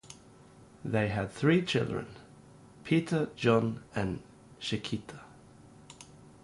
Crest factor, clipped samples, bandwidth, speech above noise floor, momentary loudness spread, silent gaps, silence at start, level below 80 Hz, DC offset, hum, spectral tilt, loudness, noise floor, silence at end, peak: 20 dB; under 0.1%; 11.5 kHz; 25 dB; 24 LU; none; 0.1 s; -58 dBFS; under 0.1%; none; -6.5 dB/octave; -31 LUFS; -56 dBFS; 0.15 s; -12 dBFS